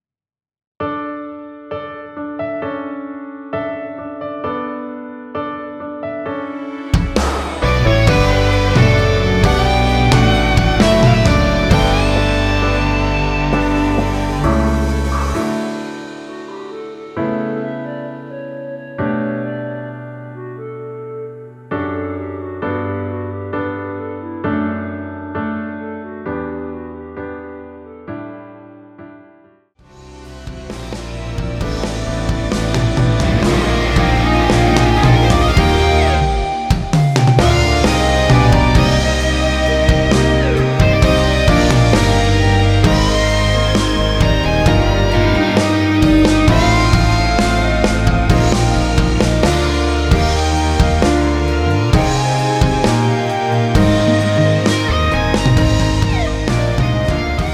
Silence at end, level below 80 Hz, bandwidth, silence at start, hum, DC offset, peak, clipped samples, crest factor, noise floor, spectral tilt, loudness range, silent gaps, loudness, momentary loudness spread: 0 s; -22 dBFS; 15 kHz; 0.8 s; none; under 0.1%; 0 dBFS; under 0.1%; 14 dB; -49 dBFS; -6 dB/octave; 13 LU; none; -15 LUFS; 17 LU